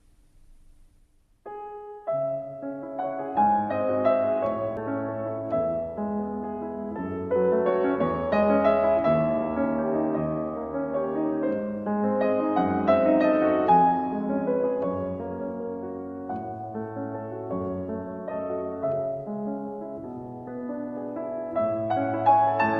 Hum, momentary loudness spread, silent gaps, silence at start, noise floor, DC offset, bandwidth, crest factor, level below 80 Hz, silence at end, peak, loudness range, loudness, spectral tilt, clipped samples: none; 13 LU; none; 0.5 s; -60 dBFS; under 0.1%; 5.4 kHz; 20 dB; -60 dBFS; 0 s; -6 dBFS; 9 LU; -26 LUFS; -10 dB/octave; under 0.1%